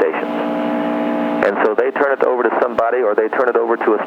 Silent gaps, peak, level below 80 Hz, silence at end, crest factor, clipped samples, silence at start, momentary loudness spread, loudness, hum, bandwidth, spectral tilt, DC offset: none; -2 dBFS; -60 dBFS; 0 s; 14 dB; under 0.1%; 0 s; 4 LU; -17 LUFS; none; 7.4 kHz; -7 dB/octave; under 0.1%